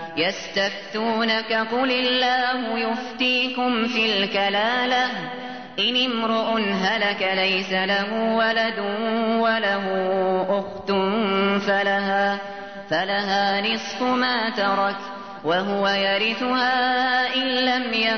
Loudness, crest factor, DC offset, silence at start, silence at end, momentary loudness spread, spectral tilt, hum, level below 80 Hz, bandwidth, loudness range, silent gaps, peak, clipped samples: -21 LUFS; 14 dB; 0.3%; 0 s; 0 s; 5 LU; -4.5 dB/octave; none; -66 dBFS; 6.6 kHz; 1 LU; none; -10 dBFS; under 0.1%